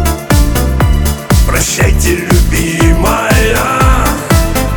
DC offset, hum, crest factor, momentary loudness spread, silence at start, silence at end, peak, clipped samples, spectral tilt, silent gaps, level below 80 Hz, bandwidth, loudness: under 0.1%; none; 10 dB; 2 LU; 0 s; 0 s; 0 dBFS; under 0.1%; -5 dB/octave; none; -14 dBFS; over 20 kHz; -11 LUFS